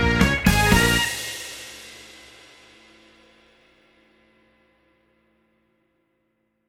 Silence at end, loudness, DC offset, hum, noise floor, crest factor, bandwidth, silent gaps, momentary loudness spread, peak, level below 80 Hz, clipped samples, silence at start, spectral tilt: 4.65 s; -19 LUFS; under 0.1%; none; -71 dBFS; 24 dB; 19.5 kHz; none; 25 LU; -2 dBFS; -34 dBFS; under 0.1%; 0 s; -4 dB/octave